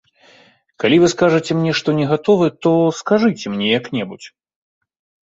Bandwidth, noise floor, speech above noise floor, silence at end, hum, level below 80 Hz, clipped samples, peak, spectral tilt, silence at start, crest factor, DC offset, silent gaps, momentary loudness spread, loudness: 8 kHz; -51 dBFS; 35 dB; 0.95 s; none; -56 dBFS; under 0.1%; -2 dBFS; -5.5 dB/octave; 0.8 s; 16 dB; under 0.1%; none; 9 LU; -16 LUFS